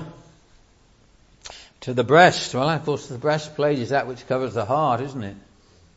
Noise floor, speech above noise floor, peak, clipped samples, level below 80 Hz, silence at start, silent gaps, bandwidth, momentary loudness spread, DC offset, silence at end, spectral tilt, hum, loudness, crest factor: -56 dBFS; 35 dB; -2 dBFS; under 0.1%; -58 dBFS; 0 s; none; 8 kHz; 22 LU; under 0.1%; 0.6 s; -5 dB/octave; none; -21 LUFS; 22 dB